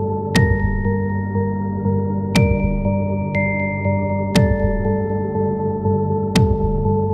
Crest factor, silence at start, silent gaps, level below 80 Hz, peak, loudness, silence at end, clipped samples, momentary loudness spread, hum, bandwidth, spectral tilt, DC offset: 16 dB; 0 s; none; -28 dBFS; -2 dBFS; -19 LUFS; 0 s; under 0.1%; 4 LU; none; 13 kHz; -7 dB/octave; under 0.1%